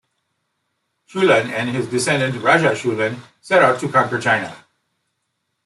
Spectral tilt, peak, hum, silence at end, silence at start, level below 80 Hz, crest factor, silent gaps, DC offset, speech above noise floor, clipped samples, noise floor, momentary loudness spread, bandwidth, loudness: -4.5 dB/octave; -2 dBFS; none; 1.1 s; 1.15 s; -64 dBFS; 18 dB; none; under 0.1%; 56 dB; under 0.1%; -74 dBFS; 8 LU; 12 kHz; -17 LUFS